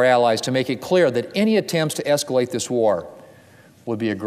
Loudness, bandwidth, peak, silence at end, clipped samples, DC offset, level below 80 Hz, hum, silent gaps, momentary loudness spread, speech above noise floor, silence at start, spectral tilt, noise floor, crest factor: -20 LUFS; 16 kHz; -4 dBFS; 0 s; under 0.1%; under 0.1%; -64 dBFS; none; none; 8 LU; 30 dB; 0 s; -4.5 dB/octave; -49 dBFS; 16 dB